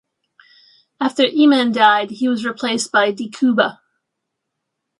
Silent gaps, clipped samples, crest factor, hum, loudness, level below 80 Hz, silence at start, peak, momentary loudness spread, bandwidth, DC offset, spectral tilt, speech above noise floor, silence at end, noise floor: none; under 0.1%; 18 dB; none; -16 LUFS; -72 dBFS; 1 s; 0 dBFS; 8 LU; 11.5 kHz; under 0.1%; -3.5 dB/octave; 62 dB; 1.3 s; -78 dBFS